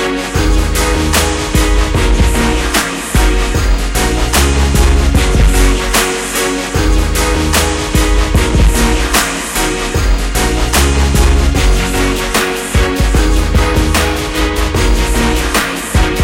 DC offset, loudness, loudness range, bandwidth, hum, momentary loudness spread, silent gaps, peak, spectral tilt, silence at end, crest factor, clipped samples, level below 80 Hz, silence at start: under 0.1%; -13 LUFS; 1 LU; 17 kHz; none; 3 LU; none; 0 dBFS; -4 dB/octave; 0 s; 12 dB; under 0.1%; -14 dBFS; 0 s